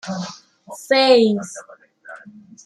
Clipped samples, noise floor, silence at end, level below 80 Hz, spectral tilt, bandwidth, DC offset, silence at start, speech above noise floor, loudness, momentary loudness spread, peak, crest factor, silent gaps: under 0.1%; -43 dBFS; 0.5 s; -70 dBFS; -4.5 dB/octave; 13 kHz; under 0.1%; 0.05 s; 25 dB; -17 LUFS; 26 LU; -2 dBFS; 18 dB; none